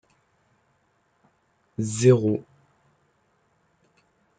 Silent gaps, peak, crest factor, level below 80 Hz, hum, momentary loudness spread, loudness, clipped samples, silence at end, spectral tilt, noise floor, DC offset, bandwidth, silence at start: none; -6 dBFS; 22 dB; -66 dBFS; none; 14 LU; -22 LUFS; under 0.1%; 2 s; -6.5 dB/octave; -68 dBFS; under 0.1%; 9.4 kHz; 1.8 s